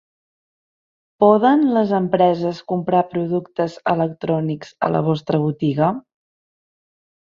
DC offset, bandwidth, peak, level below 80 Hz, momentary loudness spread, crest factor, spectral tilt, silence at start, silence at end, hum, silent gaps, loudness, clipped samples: under 0.1%; 7.4 kHz; -2 dBFS; -60 dBFS; 9 LU; 18 dB; -8.5 dB/octave; 1.2 s; 1.3 s; none; none; -19 LUFS; under 0.1%